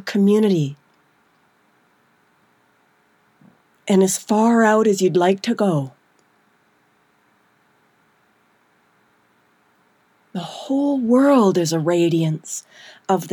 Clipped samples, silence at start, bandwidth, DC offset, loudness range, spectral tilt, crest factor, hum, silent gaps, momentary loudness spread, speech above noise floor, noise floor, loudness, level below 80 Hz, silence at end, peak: under 0.1%; 0.05 s; 18.5 kHz; under 0.1%; 11 LU; -5.5 dB/octave; 18 dB; none; none; 16 LU; 44 dB; -61 dBFS; -18 LUFS; -80 dBFS; 0 s; -4 dBFS